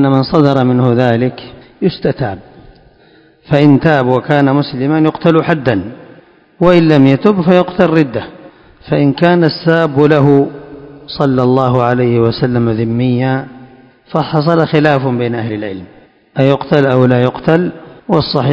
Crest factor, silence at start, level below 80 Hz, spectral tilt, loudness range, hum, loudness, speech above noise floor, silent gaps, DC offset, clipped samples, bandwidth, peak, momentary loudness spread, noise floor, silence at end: 12 dB; 0 s; -44 dBFS; -9 dB/octave; 3 LU; none; -12 LUFS; 35 dB; none; under 0.1%; 0.9%; 8 kHz; 0 dBFS; 12 LU; -46 dBFS; 0 s